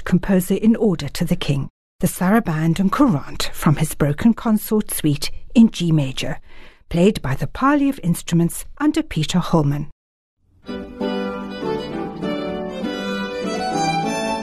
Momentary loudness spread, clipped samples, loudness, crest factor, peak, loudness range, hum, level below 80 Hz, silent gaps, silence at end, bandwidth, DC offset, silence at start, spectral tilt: 10 LU; under 0.1%; -20 LUFS; 16 dB; -2 dBFS; 6 LU; none; -38 dBFS; 1.70-1.99 s, 9.92-10.37 s; 0 s; 13 kHz; under 0.1%; 0 s; -6 dB/octave